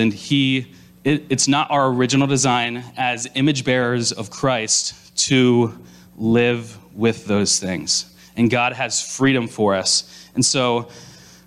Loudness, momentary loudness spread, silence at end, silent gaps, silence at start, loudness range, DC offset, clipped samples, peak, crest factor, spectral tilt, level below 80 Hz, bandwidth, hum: -19 LUFS; 8 LU; 0.35 s; none; 0 s; 1 LU; under 0.1%; under 0.1%; -4 dBFS; 14 dB; -3.5 dB/octave; -56 dBFS; 12.5 kHz; none